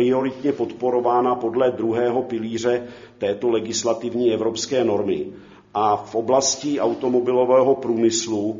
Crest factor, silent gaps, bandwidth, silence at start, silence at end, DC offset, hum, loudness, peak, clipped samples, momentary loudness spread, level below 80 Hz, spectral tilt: 16 dB; none; 7.6 kHz; 0 s; 0 s; under 0.1%; none; -21 LUFS; -4 dBFS; under 0.1%; 7 LU; -62 dBFS; -4.5 dB/octave